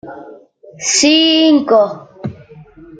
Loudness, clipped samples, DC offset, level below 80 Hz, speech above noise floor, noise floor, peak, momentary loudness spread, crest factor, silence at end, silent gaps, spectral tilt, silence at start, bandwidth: -11 LUFS; under 0.1%; under 0.1%; -56 dBFS; 28 dB; -39 dBFS; 0 dBFS; 19 LU; 14 dB; 0.05 s; none; -2.5 dB/octave; 0.05 s; 9.4 kHz